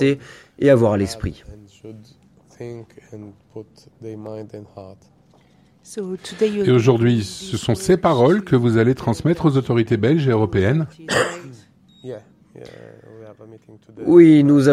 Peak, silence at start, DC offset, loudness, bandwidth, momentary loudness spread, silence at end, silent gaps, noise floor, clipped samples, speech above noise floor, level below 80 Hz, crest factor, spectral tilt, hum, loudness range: 0 dBFS; 0 s; under 0.1%; -17 LUFS; 13 kHz; 24 LU; 0 s; none; -54 dBFS; under 0.1%; 36 dB; -48 dBFS; 18 dB; -7 dB/octave; none; 20 LU